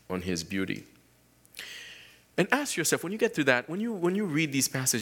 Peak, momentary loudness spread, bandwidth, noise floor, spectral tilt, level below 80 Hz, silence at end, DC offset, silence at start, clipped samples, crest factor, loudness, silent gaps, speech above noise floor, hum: -6 dBFS; 17 LU; 19 kHz; -62 dBFS; -3.5 dB/octave; -66 dBFS; 0 s; under 0.1%; 0.1 s; under 0.1%; 24 dB; -28 LUFS; none; 34 dB; none